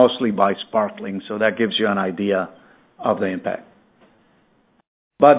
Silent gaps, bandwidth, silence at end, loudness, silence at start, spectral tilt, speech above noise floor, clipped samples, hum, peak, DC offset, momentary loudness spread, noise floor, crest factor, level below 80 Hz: 4.87-5.11 s; 4 kHz; 0 s; -21 LUFS; 0 s; -9.5 dB/octave; 40 dB; under 0.1%; none; 0 dBFS; under 0.1%; 10 LU; -60 dBFS; 20 dB; -62 dBFS